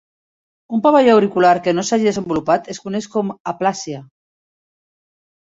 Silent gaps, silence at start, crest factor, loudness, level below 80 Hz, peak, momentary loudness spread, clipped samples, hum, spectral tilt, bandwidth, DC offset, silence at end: 3.40-3.45 s; 0.7 s; 16 dB; -17 LUFS; -58 dBFS; -2 dBFS; 13 LU; under 0.1%; none; -5 dB/octave; 8 kHz; under 0.1%; 1.35 s